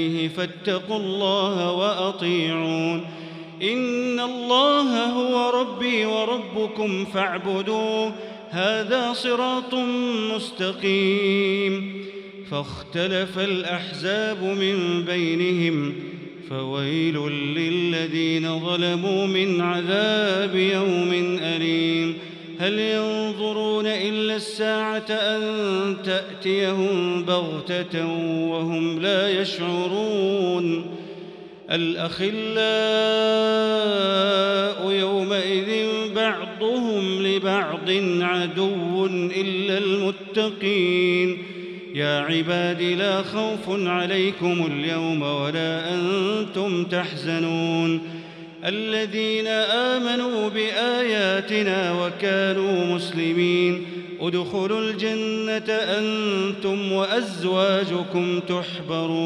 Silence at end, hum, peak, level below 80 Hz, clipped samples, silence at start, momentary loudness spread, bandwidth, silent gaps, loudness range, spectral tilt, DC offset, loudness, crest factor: 0 s; none; -6 dBFS; -70 dBFS; under 0.1%; 0 s; 7 LU; 11 kHz; none; 3 LU; -5.5 dB/octave; under 0.1%; -23 LUFS; 18 dB